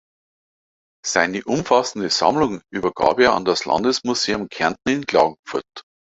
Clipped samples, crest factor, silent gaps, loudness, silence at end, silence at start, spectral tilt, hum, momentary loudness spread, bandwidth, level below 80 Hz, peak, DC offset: under 0.1%; 20 dB; 5.39-5.43 s; -20 LUFS; 0.35 s; 1.05 s; -3.5 dB/octave; none; 8 LU; 8.2 kHz; -54 dBFS; -2 dBFS; under 0.1%